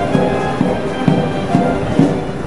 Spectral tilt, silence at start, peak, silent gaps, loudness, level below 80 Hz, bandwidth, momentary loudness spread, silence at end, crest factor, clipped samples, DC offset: -7.5 dB/octave; 0 s; 0 dBFS; none; -16 LUFS; -36 dBFS; 11.5 kHz; 2 LU; 0 s; 16 dB; under 0.1%; 3%